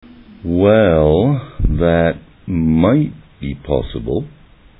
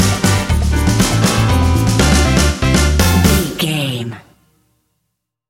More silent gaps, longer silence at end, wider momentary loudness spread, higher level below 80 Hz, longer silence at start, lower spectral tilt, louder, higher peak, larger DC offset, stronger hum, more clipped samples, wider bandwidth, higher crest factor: neither; second, 0.5 s vs 1.3 s; first, 16 LU vs 6 LU; second, -28 dBFS vs -20 dBFS; first, 0.45 s vs 0 s; first, -10.5 dB/octave vs -4.5 dB/octave; about the same, -15 LUFS vs -14 LUFS; about the same, 0 dBFS vs 0 dBFS; neither; neither; neither; second, 4 kHz vs 17 kHz; about the same, 16 dB vs 14 dB